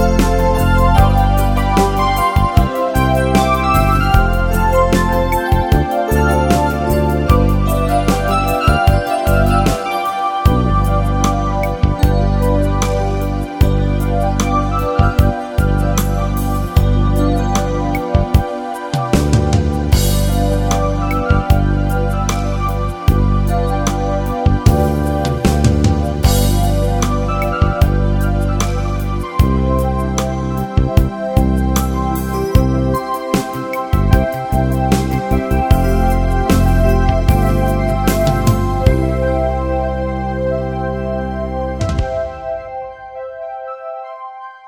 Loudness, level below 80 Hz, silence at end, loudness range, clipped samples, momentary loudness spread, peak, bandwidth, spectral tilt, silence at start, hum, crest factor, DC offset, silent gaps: -15 LUFS; -18 dBFS; 0 s; 3 LU; under 0.1%; 7 LU; 0 dBFS; 19.5 kHz; -6.5 dB/octave; 0 s; none; 14 dB; under 0.1%; none